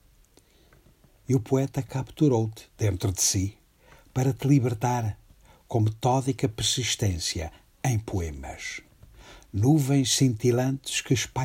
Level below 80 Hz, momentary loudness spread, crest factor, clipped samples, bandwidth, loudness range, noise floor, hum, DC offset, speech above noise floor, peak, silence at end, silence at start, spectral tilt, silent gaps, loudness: -50 dBFS; 13 LU; 18 dB; under 0.1%; 16 kHz; 3 LU; -59 dBFS; none; under 0.1%; 34 dB; -8 dBFS; 0 s; 1.3 s; -5 dB/octave; none; -26 LUFS